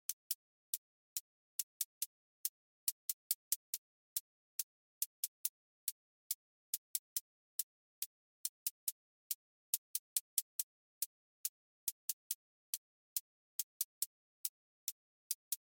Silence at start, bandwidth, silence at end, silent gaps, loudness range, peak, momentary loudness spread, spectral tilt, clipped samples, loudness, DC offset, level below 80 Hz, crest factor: 0.1 s; 17 kHz; 0.15 s; 0.13-15.51 s; 2 LU; -16 dBFS; 7 LU; 8.5 dB/octave; under 0.1%; -43 LUFS; under 0.1%; under -90 dBFS; 32 dB